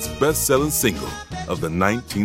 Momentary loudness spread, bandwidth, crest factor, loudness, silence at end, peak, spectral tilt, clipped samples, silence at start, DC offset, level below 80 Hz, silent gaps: 12 LU; 17 kHz; 20 dB; -21 LUFS; 0 s; -2 dBFS; -4 dB/octave; under 0.1%; 0 s; under 0.1%; -38 dBFS; none